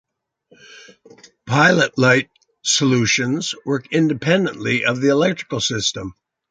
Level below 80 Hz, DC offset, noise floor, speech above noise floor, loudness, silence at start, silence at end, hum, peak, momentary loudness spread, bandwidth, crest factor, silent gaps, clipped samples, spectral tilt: -54 dBFS; under 0.1%; -57 dBFS; 39 dB; -18 LUFS; 0.7 s; 0.4 s; none; -2 dBFS; 9 LU; 9.6 kHz; 18 dB; none; under 0.1%; -4 dB/octave